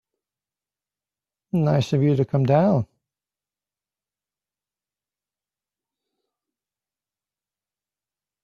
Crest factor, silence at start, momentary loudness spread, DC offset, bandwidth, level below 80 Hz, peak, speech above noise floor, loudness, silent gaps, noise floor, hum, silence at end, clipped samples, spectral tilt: 22 dB; 1.55 s; 8 LU; under 0.1%; 7.2 kHz; -62 dBFS; -6 dBFS; over 71 dB; -21 LUFS; none; under -90 dBFS; 50 Hz at -50 dBFS; 5.6 s; under 0.1%; -8.5 dB/octave